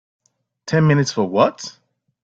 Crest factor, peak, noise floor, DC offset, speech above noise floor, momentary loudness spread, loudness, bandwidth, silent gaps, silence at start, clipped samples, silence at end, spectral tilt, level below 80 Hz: 20 dB; 0 dBFS; -44 dBFS; under 0.1%; 27 dB; 18 LU; -18 LUFS; 7.8 kHz; none; 0.65 s; under 0.1%; 0.5 s; -6 dB/octave; -56 dBFS